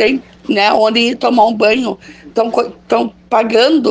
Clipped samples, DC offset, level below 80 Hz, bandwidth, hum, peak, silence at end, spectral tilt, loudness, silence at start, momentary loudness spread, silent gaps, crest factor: under 0.1%; under 0.1%; -52 dBFS; 9.6 kHz; none; 0 dBFS; 0 s; -4.5 dB/octave; -13 LUFS; 0 s; 9 LU; none; 12 dB